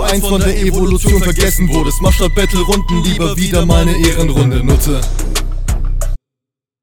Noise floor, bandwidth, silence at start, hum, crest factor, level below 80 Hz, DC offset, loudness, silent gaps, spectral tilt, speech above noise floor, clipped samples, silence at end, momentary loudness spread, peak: -83 dBFS; 19 kHz; 0 s; none; 12 dB; -14 dBFS; under 0.1%; -14 LUFS; none; -5 dB/octave; 72 dB; under 0.1%; 0.65 s; 8 LU; 0 dBFS